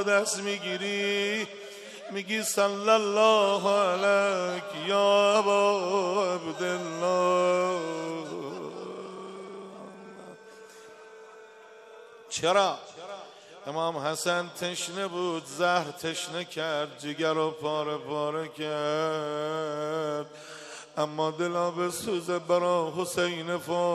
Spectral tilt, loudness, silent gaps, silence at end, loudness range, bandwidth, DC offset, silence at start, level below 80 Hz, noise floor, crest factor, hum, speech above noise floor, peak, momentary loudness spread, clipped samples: -3.5 dB/octave; -28 LUFS; none; 0 s; 10 LU; 14.5 kHz; under 0.1%; 0 s; -76 dBFS; -50 dBFS; 20 dB; none; 23 dB; -8 dBFS; 19 LU; under 0.1%